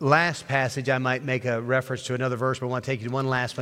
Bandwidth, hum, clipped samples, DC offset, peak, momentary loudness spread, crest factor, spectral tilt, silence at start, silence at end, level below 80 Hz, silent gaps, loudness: 14 kHz; none; under 0.1%; under 0.1%; -4 dBFS; 5 LU; 20 dB; -5.5 dB/octave; 0 s; 0 s; -64 dBFS; none; -26 LUFS